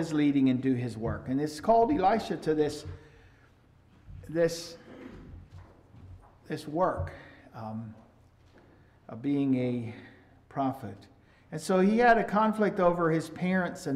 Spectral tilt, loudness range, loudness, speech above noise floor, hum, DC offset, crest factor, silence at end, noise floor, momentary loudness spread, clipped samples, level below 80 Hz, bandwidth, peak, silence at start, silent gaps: -6.5 dB/octave; 10 LU; -28 LUFS; 32 dB; none; under 0.1%; 20 dB; 0 s; -60 dBFS; 23 LU; under 0.1%; -56 dBFS; 14.5 kHz; -10 dBFS; 0 s; none